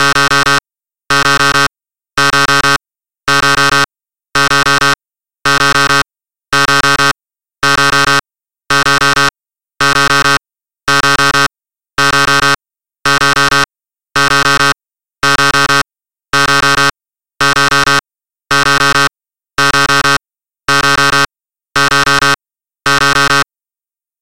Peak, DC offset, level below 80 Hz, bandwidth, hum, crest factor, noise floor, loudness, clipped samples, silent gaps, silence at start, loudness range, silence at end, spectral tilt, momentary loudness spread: 0 dBFS; 3%; -40 dBFS; 17 kHz; none; 12 dB; under -90 dBFS; -10 LUFS; under 0.1%; none; 0 s; 1 LU; 0 s; -2 dB/octave; 9 LU